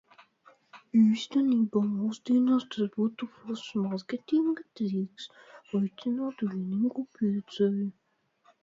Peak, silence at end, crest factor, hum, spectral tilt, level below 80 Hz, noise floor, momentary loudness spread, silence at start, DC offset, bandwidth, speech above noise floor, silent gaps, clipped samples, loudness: -14 dBFS; 0.7 s; 16 dB; none; -7.5 dB/octave; -76 dBFS; -67 dBFS; 11 LU; 0.75 s; under 0.1%; 7.6 kHz; 39 dB; none; under 0.1%; -29 LUFS